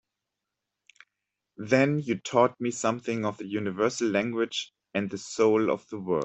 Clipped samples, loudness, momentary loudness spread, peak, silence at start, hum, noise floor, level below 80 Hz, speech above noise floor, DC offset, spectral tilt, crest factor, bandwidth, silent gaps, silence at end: under 0.1%; -27 LUFS; 9 LU; -8 dBFS; 1.6 s; none; -86 dBFS; -70 dBFS; 59 dB; under 0.1%; -5 dB/octave; 20 dB; 8.4 kHz; none; 0 s